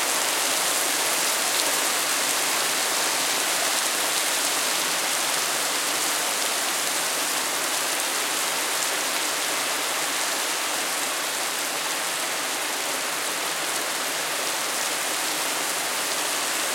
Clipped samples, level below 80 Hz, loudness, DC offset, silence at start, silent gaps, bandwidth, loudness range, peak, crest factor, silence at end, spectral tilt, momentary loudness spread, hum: under 0.1%; -80 dBFS; -23 LUFS; under 0.1%; 0 s; none; 16.5 kHz; 3 LU; -6 dBFS; 20 dB; 0 s; 1 dB/octave; 4 LU; none